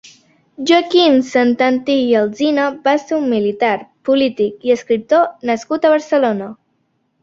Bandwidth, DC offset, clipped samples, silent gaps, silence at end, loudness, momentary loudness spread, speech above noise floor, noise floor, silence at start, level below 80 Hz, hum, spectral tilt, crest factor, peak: 7.6 kHz; under 0.1%; under 0.1%; none; 0.7 s; -15 LUFS; 7 LU; 50 dB; -65 dBFS; 0.6 s; -60 dBFS; none; -4.5 dB/octave; 14 dB; -2 dBFS